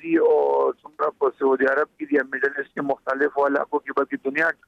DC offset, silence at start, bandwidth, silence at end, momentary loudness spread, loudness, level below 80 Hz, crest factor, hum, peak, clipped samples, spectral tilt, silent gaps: under 0.1%; 0.05 s; 6.6 kHz; 0.15 s; 8 LU; -22 LUFS; -72 dBFS; 14 dB; none; -8 dBFS; under 0.1%; -7 dB/octave; none